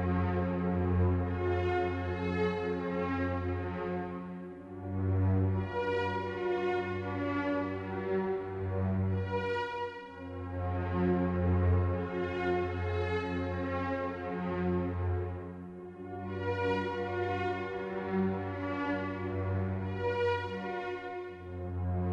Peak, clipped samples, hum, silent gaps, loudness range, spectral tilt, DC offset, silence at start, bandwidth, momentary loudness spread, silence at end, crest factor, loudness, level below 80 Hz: -18 dBFS; under 0.1%; none; none; 3 LU; -9 dB/octave; under 0.1%; 0 s; 6.6 kHz; 10 LU; 0 s; 14 dB; -34 LUFS; -52 dBFS